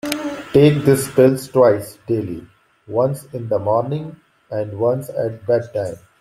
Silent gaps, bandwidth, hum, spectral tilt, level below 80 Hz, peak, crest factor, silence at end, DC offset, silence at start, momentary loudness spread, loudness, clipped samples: none; 15.5 kHz; none; -6.5 dB/octave; -54 dBFS; -2 dBFS; 16 dB; 0.25 s; under 0.1%; 0.05 s; 14 LU; -18 LUFS; under 0.1%